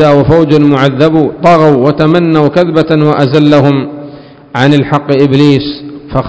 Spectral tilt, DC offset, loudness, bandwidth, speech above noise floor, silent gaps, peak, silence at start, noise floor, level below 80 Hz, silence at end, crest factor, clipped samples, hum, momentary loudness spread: -8 dB/octave; under 0.1%; -8 LUFS; 8 kHz; 23 dB; none; 0 dBFS; 0 s; -30 dBFS; -36 dBFS; 0 s; 8 dB; 6%; none; 9 LU